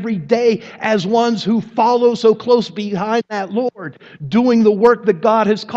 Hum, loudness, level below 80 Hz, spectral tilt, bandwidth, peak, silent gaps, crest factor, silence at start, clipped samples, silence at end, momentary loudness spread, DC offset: none; -15 LUFS; -60 dBFS; -6.5 dB/octave; 7.8 kHz; 0 dBFS; none; 16 dB; 0 s; under 0.1%; 0 s; 9 LU; under 0.1%